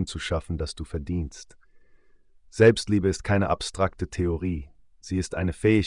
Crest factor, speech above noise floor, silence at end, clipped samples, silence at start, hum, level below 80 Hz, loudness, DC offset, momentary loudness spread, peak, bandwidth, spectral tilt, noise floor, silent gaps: 20 dB; 31 dB; 0 s; under 0.1%; 0 s; none; -44 dBFS; -26 LUFS; under 0.1%; 14 LU; -6 dBFS; 10.5 kHz; -6 dB/octave; -55 dBFS; none